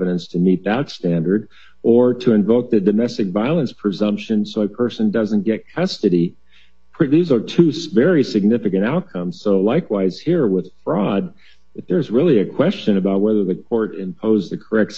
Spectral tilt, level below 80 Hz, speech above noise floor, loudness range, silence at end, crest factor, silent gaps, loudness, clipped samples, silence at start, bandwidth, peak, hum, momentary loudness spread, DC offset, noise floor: -8 dB/octave; -60 dBFS; 38 dB; 2 LU; 0 s; 18 dB; none; -18 LUFS; under 0.1%; 0 s; 7.6 kHz; 0 dBFS; none; 7 LU; 0.7%; -55 dBFS